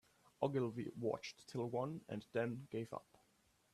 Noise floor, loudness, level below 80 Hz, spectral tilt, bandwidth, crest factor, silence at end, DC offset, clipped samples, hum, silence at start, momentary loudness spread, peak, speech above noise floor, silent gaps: -76 dBFS; -44 LUFS; -80 dBFS; -7 dB/octave; 14 kHz; 22 dB; 0.7 s; under 0.1%; under 0.1%; none; 0.4 s; 8 LU; -22 dBFS; 33 dB; none